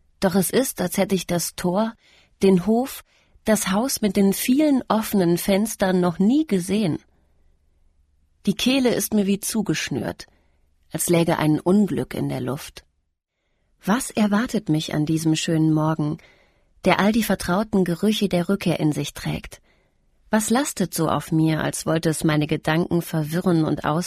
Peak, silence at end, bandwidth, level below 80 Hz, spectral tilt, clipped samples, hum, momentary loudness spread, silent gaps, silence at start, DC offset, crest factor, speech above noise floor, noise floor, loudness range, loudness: -4 dBFS; 0 s; 15.5 kHz; -50 dBFS; -5.5 dB/octave; under 0.1%; none; 9 LU; none; 0.2 s; under 0.1%; 18 dB; 53 dB; -74 dBFS; 4 LU; -22 LUFS